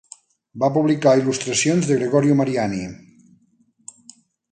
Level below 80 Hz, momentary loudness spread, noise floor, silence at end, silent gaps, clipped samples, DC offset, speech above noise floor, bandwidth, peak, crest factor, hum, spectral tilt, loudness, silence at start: -58 dBFS; 15 LU; -61 dBFS; 1.55 s; none; under 0.1%; under 0.1%; 43 dB; 9.6 kHz; -4 dBFS; 18 dB; none; -5 dB/octave; -19 LUFS; 0.55 s